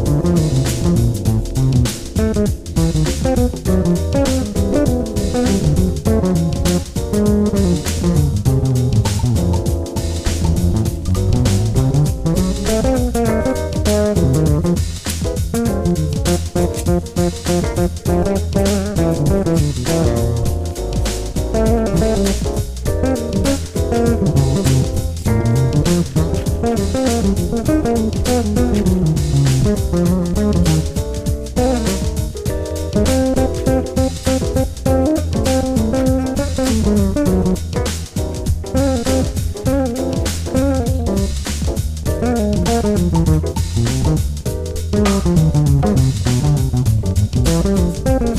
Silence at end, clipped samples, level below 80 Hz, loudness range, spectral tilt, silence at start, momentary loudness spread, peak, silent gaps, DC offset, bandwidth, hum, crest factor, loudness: 0 s; under 0.1%; -24 dBFS; 2 LU; -6.5 dB/octave; 0 s; 5 LU; -2 dBFS; none; under 0.1%; 16 kHz; none; 14 dB; -17 LUFS